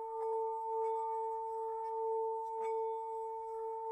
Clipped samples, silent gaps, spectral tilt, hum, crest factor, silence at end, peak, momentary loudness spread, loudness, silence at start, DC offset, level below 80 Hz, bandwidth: under 0.1%; none; -3.5 dB/octave; none; 10 dB; 0 s; -28 dBFS; 5 LU; -39 LUFS; 0 s; under 0.1%; -80 dBFS; 9.4 kHz